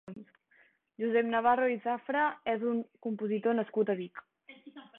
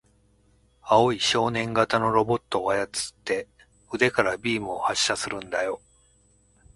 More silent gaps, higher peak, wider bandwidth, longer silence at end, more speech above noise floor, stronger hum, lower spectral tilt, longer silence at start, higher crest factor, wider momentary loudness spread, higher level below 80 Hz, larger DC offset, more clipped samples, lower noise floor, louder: neither; second, -14 dBFS vs -4 dBFS; second, 4 kHz vs 11.5 kHz; second, 0.15 s vs 1 s; about the same, 36 dB vs 38 dB; neither; first, -9 dB/octave vs -3.5 dB/octave; second, 0.05 s vs 0.85 s; about the same, 18 dB vs 22 dB; first, 22 LU vs 9 LU; second, -76 dBFS vs -56 dBFS; neither; neither; first, -67 dBFS vs -62 dBFS; second, -31 LUFS vs -24 LUFS